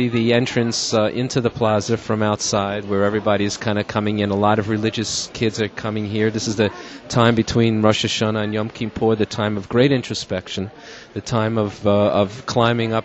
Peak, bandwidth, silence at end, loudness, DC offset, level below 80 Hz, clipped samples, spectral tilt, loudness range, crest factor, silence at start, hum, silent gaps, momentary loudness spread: 0 dBFS; 8.4 kHz; 0 s; -20 LUFS; under 0.1%; -48 dBFS; under 0.1%; -5 dB/octave; 2 LU; 20 dB; 0 s; none; none; 8 LU